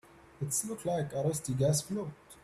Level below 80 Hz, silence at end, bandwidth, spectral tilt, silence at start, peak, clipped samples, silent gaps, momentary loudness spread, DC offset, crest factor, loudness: -64 dBFS; 0.1 s; 14.5 kHz; -5 dB/octave; 0.15 s; -18 dBFS; under 0.1%; none; 9 LU; under 0.1%; 16 dB; -33 LUFS